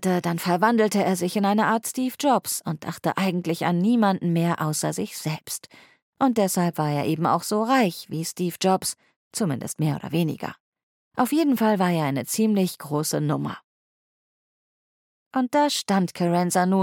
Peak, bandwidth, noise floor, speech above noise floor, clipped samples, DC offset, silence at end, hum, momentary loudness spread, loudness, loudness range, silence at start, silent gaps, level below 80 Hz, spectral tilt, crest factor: -6 dBFS; 17.5 kHz; under -90 dBFS; over 67 dB; under 0.1%; under 0.1%; 0 s; none; 9 LU; -24 LUFS; 4 LU; 0 s; 6.02-6.13 s, 9.16-9.31 s, 10.60-10.72 s, 10.83-11.11 s, 13.64-15.31 s; -70 dBFS; -5 dB/octave; 18 dB